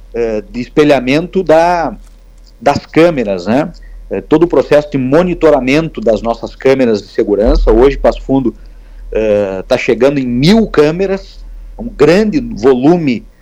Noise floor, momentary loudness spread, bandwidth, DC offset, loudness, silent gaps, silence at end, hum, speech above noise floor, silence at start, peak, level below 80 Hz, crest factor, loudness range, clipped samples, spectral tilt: -37 dBFS; 8 LU; 13 kHz; under 0.1%; -11 LUFS; none; 0.15 s; none; 27 dB; 0 s; 0 dBFS; -26 dBFS; 10 dB; 2 LU; under 0.1%; -6.5 dB/octave